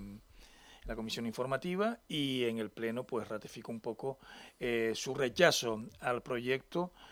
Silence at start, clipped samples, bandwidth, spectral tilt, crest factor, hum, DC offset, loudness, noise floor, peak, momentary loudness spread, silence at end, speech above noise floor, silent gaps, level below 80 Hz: 0 s; under 0.1%; over 20 kHz; -4 dB/octave; 26 dB; none; under 0.1%; -35 LUFS; -59 dBFS; -10 dBFS; 15 LU; 0 s; 23 dB; none; -60 dBFS